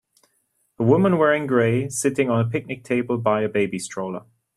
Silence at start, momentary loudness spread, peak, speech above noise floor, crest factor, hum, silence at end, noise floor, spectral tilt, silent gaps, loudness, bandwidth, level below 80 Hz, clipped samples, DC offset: 0.8 s; 11 LU; -4 dBFS; 48 dB; 18 dB; none; 0.35 s; -69 dBFS; -6 dB/octave; none; -21 LUFS; 14 kHz; -60 dBFS; under 0.1%; under 0.1%